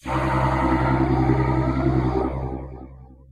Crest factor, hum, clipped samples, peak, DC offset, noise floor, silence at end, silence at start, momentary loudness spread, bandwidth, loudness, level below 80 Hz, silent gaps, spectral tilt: 14 dB; none; under 0.1%; -8 dBFS; under 0.1%; -42 dBFS; 0.15 s; 0.05 s; 12 LU; 9.6 kHz; -22 LUFS; -30 dBFS; none; -8.5 dB/octave